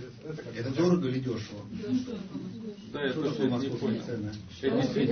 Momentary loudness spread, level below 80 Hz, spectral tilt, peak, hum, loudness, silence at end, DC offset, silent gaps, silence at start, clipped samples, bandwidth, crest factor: 13 LU; -62 dBFS; -7 dB/octave; -14 dBFS; none; -32 LUFS; 0 s; under 0.1%; none; 0 s; under 0.1%; 6.6 kHz; 18 dB